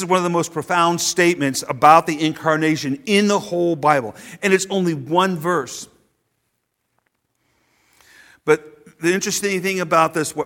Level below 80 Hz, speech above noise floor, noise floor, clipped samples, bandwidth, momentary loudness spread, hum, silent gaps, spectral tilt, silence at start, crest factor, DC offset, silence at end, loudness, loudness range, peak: -62 dBFS; 54 dB; -72 dBFS; under 0.1%; 17.5 kHz; 7 LU; none; none; -4 dB/octave; 0 s; 20 dB; under 0.1%; 0 s; -18 LUFS; 11 LU; 0 dBFS